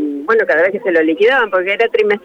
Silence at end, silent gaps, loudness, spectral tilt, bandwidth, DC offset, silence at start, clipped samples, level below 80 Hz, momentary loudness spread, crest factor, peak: 0.05 s; none; -13 LUFS; -5.5 dB/octave; 7 kHz; under 0.1%; 0 s; under 0.1%; -58 dBFS; 3 LU; 10 dB; -4 dBFS